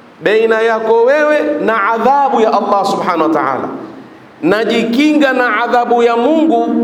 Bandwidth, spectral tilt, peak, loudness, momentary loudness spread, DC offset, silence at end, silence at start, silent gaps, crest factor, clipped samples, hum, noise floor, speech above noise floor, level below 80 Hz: 15 kHz; -5.5 dB/octave; 0 dBFS; -12 LUFS; 5 LU; under 0.1%; 0 s; 0.2 s; none; 12 dB; under 0.1%; none; -35 dBFS; 23 dB; -58 dBFS